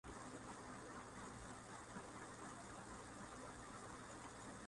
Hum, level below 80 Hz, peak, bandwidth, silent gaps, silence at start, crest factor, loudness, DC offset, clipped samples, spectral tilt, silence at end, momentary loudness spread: none; -68 dBFS; -40 dBFS; 11.5 kHz; none; 0.05 s; 14 dB; -55 LUFS; under 0.1%; under 0.1%; -4 dB/octave; 0 s; 1 LU